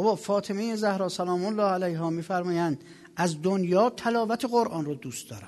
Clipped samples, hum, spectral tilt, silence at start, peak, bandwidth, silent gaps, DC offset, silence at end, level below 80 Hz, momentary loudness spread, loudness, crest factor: under 0.1%; none; -6 dB/octave; 0 s; -10 dBFS; 12.5 kHz; none; under 0.1%; 0 s; -70 dBFS; 9 LU; -27 LUFS; 16 dB